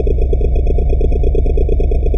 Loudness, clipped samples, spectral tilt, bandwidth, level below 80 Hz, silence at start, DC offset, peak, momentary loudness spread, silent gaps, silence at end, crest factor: -16 LUFS; under 0.1%; -10.5 dB/octave; 3.6 kHz; -12 dBFS; 0 s; 2%; -4 dBFS; 0 LU; none; 0 s; 8 dB